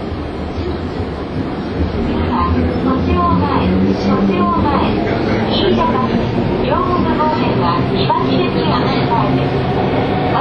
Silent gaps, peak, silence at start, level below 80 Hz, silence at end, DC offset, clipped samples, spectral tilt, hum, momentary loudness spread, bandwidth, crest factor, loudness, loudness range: none; -2 dBFS; 0 s; -28 dBFS; 0 s; under 0.1%; under 0.1%; -8.5 dB/octave; none; 7 LU; 6.8 kHz; 14 dB; -15 LUFS; 2 LU